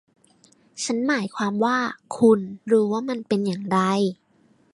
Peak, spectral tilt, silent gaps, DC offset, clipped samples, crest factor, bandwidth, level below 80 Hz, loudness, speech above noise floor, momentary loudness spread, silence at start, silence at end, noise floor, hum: -4 dBFS; -5.5 dB/octave; none; under 0.1%; under 0.1%; 18 dB; 11.5 kHz; -68 dBFS; -23 LUFS; 38 dB; 9 LU; 0.75 s; 0.6 s; -60 dBFS; none